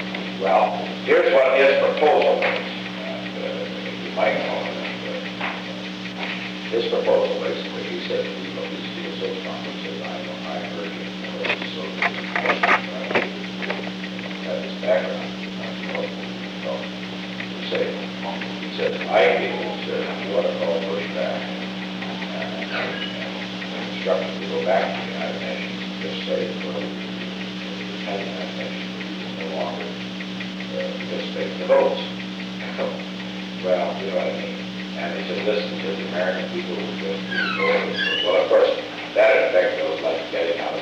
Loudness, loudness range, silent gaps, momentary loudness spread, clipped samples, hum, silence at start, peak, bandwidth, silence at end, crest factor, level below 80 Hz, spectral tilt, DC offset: -24 LUFS; 8 LU; none; 12 LU; under 0.1%; 60 Hz at -50 dBFS; 0 s; -4 dBFS; 9 kHz; 0 s; 20 dB; -60 dBFS; -5.5 dB/octave; under 0.1%